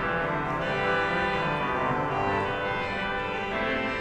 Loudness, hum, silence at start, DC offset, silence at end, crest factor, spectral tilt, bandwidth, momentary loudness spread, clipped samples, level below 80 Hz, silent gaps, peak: -27 LUFS; none; 0 s; under 0.1%; 0 s; 14 dB; -6 dB/octave; 12.5 kHz; 4 LU; under 0.1%; -46 dBFS; none; -14 dBFS